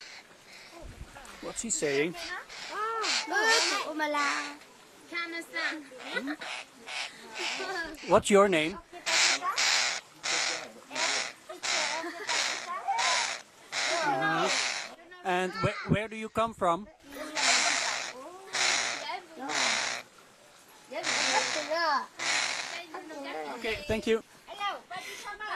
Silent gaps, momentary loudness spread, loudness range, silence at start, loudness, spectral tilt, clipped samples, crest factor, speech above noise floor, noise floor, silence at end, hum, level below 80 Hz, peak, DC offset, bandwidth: none; 16 LU; 6 LU; 0 s; -29 LUFS; -2 dB/octave; under 0.1%; 22 dB; 26 dB; -56 dBFS; 0 s; none; -60 dBFS; -10 dBFS; under 0.1%; 14 kHz